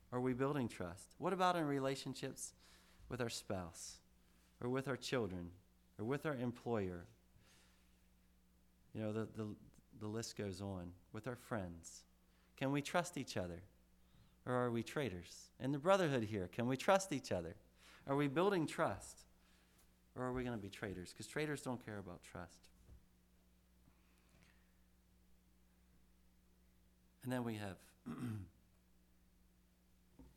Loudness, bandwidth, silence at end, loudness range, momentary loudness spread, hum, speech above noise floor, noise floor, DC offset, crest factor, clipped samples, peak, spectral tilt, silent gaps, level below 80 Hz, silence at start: -42 LUFS; 18.5 kHz; 0.1 s; 11 LU; 18 LU; 60 Hz at -70 dBFS; 30 dB; -72 dBFS; under 0.1%; 24 dB; under 0.1%; -20 dBFS; -5.5 dB/octave; none; -70 dBFS; 0.1 s